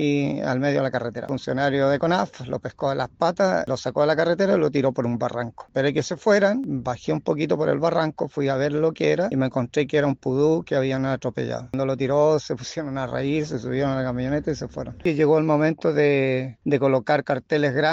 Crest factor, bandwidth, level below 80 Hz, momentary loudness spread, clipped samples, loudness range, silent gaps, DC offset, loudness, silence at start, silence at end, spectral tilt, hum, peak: 16 dB; 7.8 kHz; -54 dBFS; 8 LU; under 0.1%; 2 LU; none; under 0.1%; -23 LUFS; 0 s; 0 s; -6.5 dB/octave; none; -6 dBFS